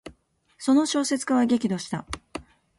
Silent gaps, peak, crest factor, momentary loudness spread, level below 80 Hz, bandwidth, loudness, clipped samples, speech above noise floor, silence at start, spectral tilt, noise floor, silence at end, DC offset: none; -10 dBFS; 16 dB; 15 LU; -54 dBFS; 11.5 kHz; -24 LUFS; under 0.1%; 37 dB; 0.05 s; -4.5 dB/octave; -61 dBFS; 0.35 s; under 0.1%